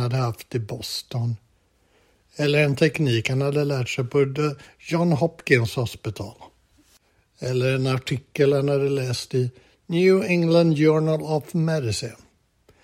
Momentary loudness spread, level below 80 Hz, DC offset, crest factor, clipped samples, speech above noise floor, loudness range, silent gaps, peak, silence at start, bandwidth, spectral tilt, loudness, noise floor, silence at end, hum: 11 LU; -58 dBFS; under 0.1%; 20 dB; under 0.1%; 41 dB; 4 LU; none; -4 dBFS; 0 s; 16 kHz; -6.5 dB/octave; -22 LUFS; -63 dBFS; 0.7 s; none